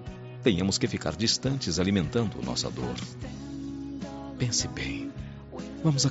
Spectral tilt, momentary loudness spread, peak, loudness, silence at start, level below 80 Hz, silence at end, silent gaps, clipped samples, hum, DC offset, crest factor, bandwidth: -5 dB/octave; 13 LU; -8 dBFS; -29 LUFS; 0 s; -50 dBFS; 0 s; none; under 0.1%; none; under 0.1%; 20 dB; 8 kHz